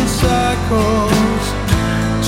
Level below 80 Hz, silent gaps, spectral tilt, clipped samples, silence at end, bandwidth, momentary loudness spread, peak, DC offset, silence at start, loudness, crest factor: -24 dBFS; none; -5.5 dB/octave; under 0.1%; 0 s; 17 kHz; 3 LU; 0 dBFS; under 0.1%; 0 s; -15 LUFS; 14 dB